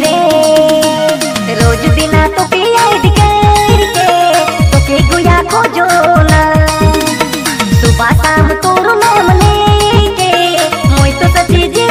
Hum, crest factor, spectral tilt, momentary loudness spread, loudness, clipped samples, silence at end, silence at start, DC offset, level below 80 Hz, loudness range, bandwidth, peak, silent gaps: none; 8 dB; -5 dB/octave; 3 LU; -8 LUFS; 1%; 0 s; 0 s; under 0.1%; -18 dBFS; 1 LU; 16.5 kHz; 0 dBFS; none